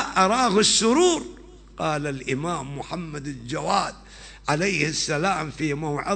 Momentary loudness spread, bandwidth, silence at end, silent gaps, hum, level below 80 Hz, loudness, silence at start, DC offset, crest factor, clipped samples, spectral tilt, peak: 15 LU; 9.2 kHz; 0 s; none; none; -48 dBFS; -23 LUFS; 0 s; under 0.1%; 18 dB; under 0.1%; -3.5 dB/octave; -6 dBFS